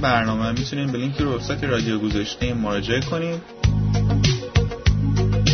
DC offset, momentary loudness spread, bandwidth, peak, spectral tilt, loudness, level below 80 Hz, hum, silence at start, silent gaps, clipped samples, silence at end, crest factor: under 0.1%; 5 LU; 6.6 kHz; -4 dBFS; -6 dB/octave; -22 LUFS; -30 dBFS; none; 0 s; none; under 0.1%; 0 s; 16 dB